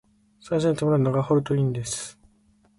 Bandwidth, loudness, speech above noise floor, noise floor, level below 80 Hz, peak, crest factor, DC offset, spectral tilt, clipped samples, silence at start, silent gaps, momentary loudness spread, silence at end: 11.5 kHz; -24 LUFS; 38 dB; -61 dBFS; -56 dBFS; -10 dBFS; 14 dB; under 0.1%; -6.5 dB/octave; under 0.1%; 0.45 s; none; 9 LU; 0.65 s